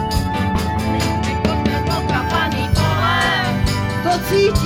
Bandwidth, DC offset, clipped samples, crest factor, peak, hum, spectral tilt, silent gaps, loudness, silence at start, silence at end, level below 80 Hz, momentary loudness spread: 17 kHz; under 0.1%; under 0.1%; 14 dB; -2 dBFS; none; -5.5 dB/octave; none; -18 LUFS; 0 s; 0 s; -28 dBFS; 4 LU